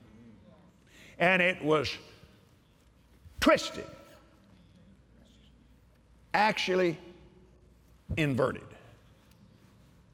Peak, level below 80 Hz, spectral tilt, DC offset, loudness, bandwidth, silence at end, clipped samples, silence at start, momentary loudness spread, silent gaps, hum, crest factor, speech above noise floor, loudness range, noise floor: -12 dBFS; -58 dBFS; -5 dB/octave; under 0.1%; -28 LUFS; 16.5 kHz; 1.45 s; under 0.1%; 1.2 s; 19 LU; none; none; 22 dB; 34 dB; 5 LU; -62 dBFS